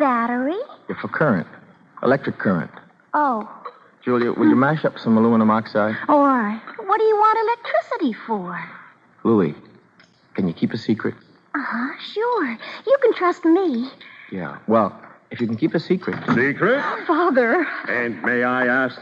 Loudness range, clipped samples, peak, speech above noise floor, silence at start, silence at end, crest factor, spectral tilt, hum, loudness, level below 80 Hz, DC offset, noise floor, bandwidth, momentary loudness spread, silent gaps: 6 LU; under 0.1%; -4 dBFS; 34 dB; 0 s; 0 s; 16 dB; -8 dB/octave; none; -20 LUFS; -68 dBFS; under 0.1%; -54 dBFS; 7.2 kHz; 14 LU; none